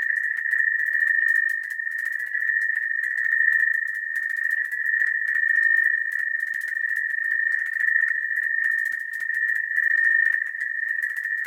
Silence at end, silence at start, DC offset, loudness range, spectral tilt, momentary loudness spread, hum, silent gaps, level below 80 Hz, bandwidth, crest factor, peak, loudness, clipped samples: 0 s; 0 s; under 0.1%; 2 LU; 2.5 dB/octave; 7 LU; none; none; -84 dBFS; 17 kHz; 16 dB; -8 dBFS; -21 LUFS; under 0.1%